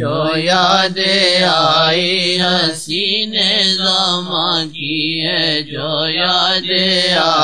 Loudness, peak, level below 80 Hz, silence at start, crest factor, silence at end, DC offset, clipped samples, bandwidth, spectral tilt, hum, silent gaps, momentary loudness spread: -13 LUFS; 0 dBFS; -64 dBFS; 0 s; 14 dB; 0 s; 0.8%; under 0.1%; 11 kHz; -3.5 dB/octave; none; none; 6 LU